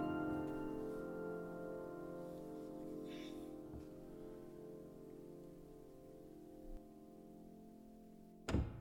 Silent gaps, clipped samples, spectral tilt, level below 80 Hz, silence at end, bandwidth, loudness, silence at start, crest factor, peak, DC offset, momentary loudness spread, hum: none; under 0.1%; -7.5 dB/octave; -58 dBFS; 0 s; 18.5 kHz; -50 LUFS; 0 s; 24 dB; -26 dBFS; under 0.1%; 16 LU; none